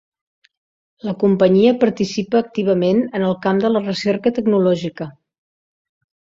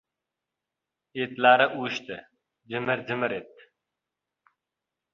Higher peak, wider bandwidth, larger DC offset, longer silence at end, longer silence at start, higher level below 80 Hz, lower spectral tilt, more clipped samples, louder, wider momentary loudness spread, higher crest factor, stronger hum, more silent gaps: first, -2 dBFS vs -6 dBFS; about the same, 7.6 kHz vs 7.2 kHz; neither; second, 1.3 s vs 1.7 s; about the same, 1.05 s vs 1.15 s; first, -58 dBFS vs -74 dBFS; first, -7 dB/octave vs -5 dB/octave; neither; first, -17 LUFS vs -25 LUFS; second, 12 LU vs 20 LU; second, 16 dB vs 24 dB; neither; neither